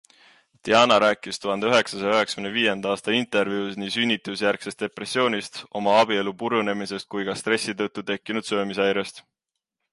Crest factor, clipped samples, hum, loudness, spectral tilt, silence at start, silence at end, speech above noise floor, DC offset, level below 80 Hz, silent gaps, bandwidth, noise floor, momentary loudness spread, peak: 20 dB; under 0.1%; none; -23 LUFS; -3.5 dB/octave; 0.65 s; 0.7 s; 60 dB; under 0.1%; -66 dBFS; none; 11.5 kHz; -84 dBFS; 10 LU; -4 dBFS